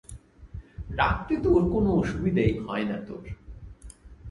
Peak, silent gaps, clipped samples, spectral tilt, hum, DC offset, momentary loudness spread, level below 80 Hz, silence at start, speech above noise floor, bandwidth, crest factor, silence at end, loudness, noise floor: -8 dBFS; none; under 0.1%; -7.5 dB/octave; none; under 0.1%; 24 LU; -40 dBFS; 0.1 s; 22 dB; 11.5 kHz; 20 dB; 0 s; -26 LUFS; -47 dBFS